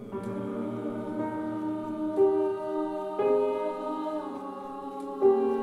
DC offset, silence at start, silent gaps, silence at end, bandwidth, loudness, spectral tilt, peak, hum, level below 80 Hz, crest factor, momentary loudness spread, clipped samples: under 0.1%; 0 s; none; 0 s; 10.5 kHz; -30 LUFS; -8 dB/octave; -12 dBFS; none; -68 dBFS; 18 dB; 13 LU; under 0.1%